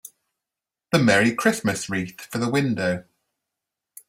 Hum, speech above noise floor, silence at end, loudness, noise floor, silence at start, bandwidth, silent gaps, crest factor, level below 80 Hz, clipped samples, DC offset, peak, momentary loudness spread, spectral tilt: none; 66 dB; 1.05 s; -22 LUFS; -88 dBFS; 0.05 s; 16 kHz; none; 20 dB; -60 dBFS; under 0.1%; under 0.1%; -4 dBFS; 11 LU; -5 dB/octave